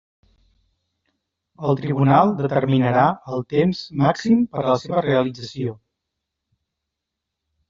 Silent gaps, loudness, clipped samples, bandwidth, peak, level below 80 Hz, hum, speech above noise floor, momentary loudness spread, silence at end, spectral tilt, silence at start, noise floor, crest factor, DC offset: none; -20 LUFS; under 0.1%; 7.6 kHz; -2 dBFS; -58 dBFS; none; 63 dB; 12 LU; 1.95 s; -6.5 dB/octave; 1.6 s; -82 dBFS; 20 dB; under 0.1%